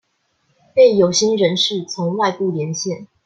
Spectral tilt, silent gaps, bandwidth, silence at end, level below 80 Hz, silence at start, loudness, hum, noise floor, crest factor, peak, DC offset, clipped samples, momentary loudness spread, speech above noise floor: -4 dB/octave; none; 9.2 kHz; 0.2 s; -62 dBFS; 0.75 s; -17 LUFS; none; -65 dBFS; 16 dB; -2 dBFS; under 0.1%; under 0.1%; 10 LU; 49 dB